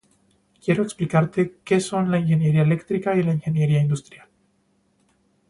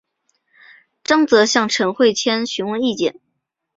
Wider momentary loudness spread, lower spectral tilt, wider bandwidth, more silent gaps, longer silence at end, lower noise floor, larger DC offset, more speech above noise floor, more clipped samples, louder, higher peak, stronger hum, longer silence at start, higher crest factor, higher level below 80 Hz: second, 5 LU vs 9 LU; first, -7.5 dB/octave vs -3 dB/octave; first, 11.5 kHz vs 7.8 kHz; neither; first, 1.5 s vs 0.65 s; second, -65 dBFS vs -74 dBFS; neither; second, 45 dB vs 58 dB; neither; second, -22 LUFS vs -17 LUFS; about the same, -4 dBFS vs -2 dBFS; neither; second, 0.65 s vs 1.1 s; about the same, 18 dB vs 18 dB; about the same, -58 dBFS vs -62 dBFS